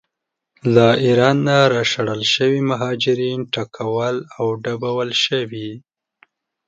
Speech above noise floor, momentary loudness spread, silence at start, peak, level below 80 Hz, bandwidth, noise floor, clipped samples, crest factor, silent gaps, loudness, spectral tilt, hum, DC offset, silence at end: 62 dB; 9 LU; 0.65 s; 0 dBFS; -60 dBFS; 9 kHz; -80 dBFS; under 0.1%; 18 dB; none; -18 LUFS; -5 dB/octave; none; under 0.1%; 0.9 s